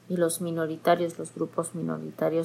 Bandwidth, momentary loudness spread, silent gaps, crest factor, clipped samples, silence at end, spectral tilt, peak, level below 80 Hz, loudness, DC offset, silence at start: 16 kHz; 8 LU; none; 18 dB; under 0.1%; 0 s; -5.5 dB/octave; -10 dBFS; -78 dBFS; -29 LUFS; under 0.1%; 0.1 s